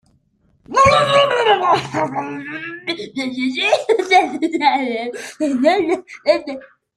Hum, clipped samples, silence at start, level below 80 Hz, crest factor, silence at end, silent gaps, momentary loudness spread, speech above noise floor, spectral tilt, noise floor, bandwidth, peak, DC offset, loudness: none; under 0.1%; 0.7 s; -50 dBFS; 16 dB; 0.3 s; none; 13 LU; 41 dB; -4 dB/octave; -60 dBFS; 13 kHz; -2 dBFS; under 0.1%; -17 LUFS